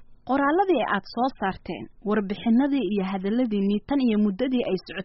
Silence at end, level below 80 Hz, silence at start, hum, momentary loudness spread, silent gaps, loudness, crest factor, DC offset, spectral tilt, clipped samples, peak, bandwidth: 0 s; -52 dBFS; 0 s; none; 7 LU; none; -24 LUFS; 14 dB; under 0.1%; -5 dB/octave; under 0.1%; -10 dBFS; 5.8 kHz